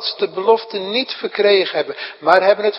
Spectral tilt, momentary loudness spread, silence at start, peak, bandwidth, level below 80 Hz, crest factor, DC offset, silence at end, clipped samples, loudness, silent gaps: -5.5 dB/octave; 9 LU; 0 s; 0 dBFS; 6 kHz; -72 dBFS; 16 dB; under 0.1%; 0 s; under 0.1%; -17 LUFS; none